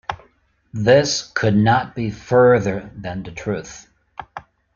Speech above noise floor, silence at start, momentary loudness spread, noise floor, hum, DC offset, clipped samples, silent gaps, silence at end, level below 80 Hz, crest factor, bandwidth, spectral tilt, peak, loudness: 41 dB; 0.1 s; 23 LU; -59 dBFS; none; under 0.1%; under 0.1%; none; 0.35 s; -48 dBFS; 18 dB; 7.4 kHz; -5.5 dB/octave; -2 dBFS; -18 LUFS